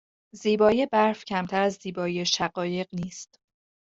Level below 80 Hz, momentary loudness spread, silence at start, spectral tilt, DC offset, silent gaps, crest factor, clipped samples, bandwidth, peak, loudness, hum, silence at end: -62 dBFS; 12 LU; 0.35 s; -4.5 dB/octave; under 0.1%; none; 20 dB; under 0.1%; 8 kHz; -6 dBFS; -25 LUFS; none; 0.6 s